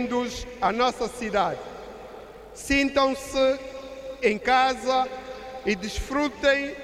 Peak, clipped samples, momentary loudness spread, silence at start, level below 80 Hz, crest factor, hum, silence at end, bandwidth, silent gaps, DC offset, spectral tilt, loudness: -8 dBFS; under 0.1%; 18 LU; 0 s; -46 dBFS; 16 dB; none; 0 s; 15 kHz; none; under 0.1%; -3.5 dB/octave; -25 LUFS